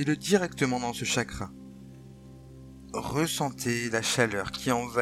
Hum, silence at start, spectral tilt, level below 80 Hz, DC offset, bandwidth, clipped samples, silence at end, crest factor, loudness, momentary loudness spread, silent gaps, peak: none; 0 s; -4 dB/octave; -54 dBFS; under 0.1%; 16.5 kHz; under 0.1%; 0 s; 20 dB; -28 LUFS; 23 LU; none; -8 dBFS